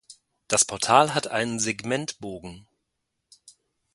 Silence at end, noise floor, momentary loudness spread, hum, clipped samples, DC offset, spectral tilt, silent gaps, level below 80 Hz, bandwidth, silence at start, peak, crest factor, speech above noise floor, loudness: 1.35 s; -80 dBFS; 18 LU; none; under 0.1%; under 0.1%; -2.5 dB/octave; none; -62 dBFS; 11.5 kHz; 0.1 s; -2 dBFS; 26 dB; 55 dB; -23 LUFS